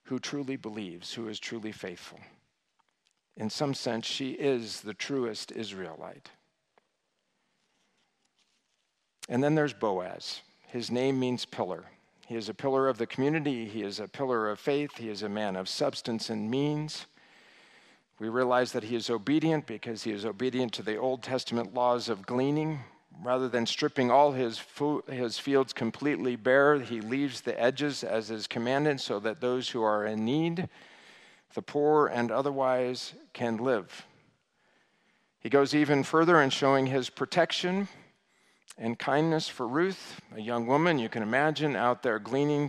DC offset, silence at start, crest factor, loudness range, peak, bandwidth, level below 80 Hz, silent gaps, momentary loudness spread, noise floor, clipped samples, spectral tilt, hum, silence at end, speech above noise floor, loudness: under 0.1%; 0.05 s; 22 dB; 8 LU; -8 dBFS; 13 kHz; -80 dBFS; none; 13 LU; -79 dBFS; under 0.1%; -5.5 dB/octave; none; 0 s; 49 dB; -30 LUFS